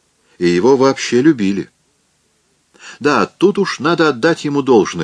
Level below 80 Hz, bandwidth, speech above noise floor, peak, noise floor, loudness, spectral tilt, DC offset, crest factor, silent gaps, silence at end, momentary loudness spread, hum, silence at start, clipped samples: -58 dBFS; 10.5 kHz; 47 dB; 0 dBFS; -60 dBFS; -14 LUFS; -5.5 dB/octave; under 0.1%; 14 dB; none; 0 s; 7 LU; none; 0.4 s; under 0.1%